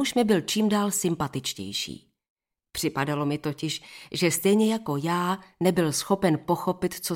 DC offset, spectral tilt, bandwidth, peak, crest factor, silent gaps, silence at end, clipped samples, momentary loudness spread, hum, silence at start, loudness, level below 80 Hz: under 0.1%; -4.5 dB/octave; 17 kHz; -8 dBFS; 18 dB; 2.30-2.36 s; 0 s; under 0.1%; 9 LU; none; 0 s; -26 LUFS; -60 dBFS